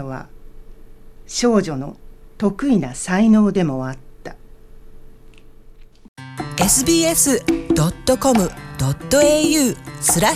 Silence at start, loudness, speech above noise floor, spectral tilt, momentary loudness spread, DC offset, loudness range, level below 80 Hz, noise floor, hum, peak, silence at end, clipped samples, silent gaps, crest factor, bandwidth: 0 s; -17 LUFS; 25 dB; -4 dB/octave; 18 LU; under 0.1%; 6 LU; -40 dBFS; -41 dBFS; none; -4 dBFS; 0 s; under 0.1%; 6.08-6.16 s; 16 dB; 16 kHz